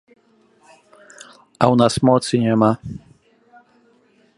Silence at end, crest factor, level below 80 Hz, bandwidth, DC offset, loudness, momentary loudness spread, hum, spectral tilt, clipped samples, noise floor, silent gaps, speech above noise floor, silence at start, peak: 1.4 s; 20 dB; -52 dBFS; 11.5 kHz; under 0.1%; -17 LUFS; 16 LU; none; -6.5 dB/octave; under 0.1%; -57 dBFS; none; 41 dB; 1.6 s; 0 dBFS